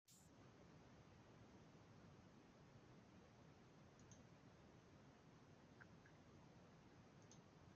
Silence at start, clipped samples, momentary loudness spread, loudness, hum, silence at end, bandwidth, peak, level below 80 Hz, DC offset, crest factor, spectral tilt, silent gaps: 0.05 s; under 0.1%; 2 LU; -68 LUFS; none; 0 s; 7.4 kHz; -50 dBFS; -84 dBFS; under 0.1%; 18 dB; -5.5 dB/octave; none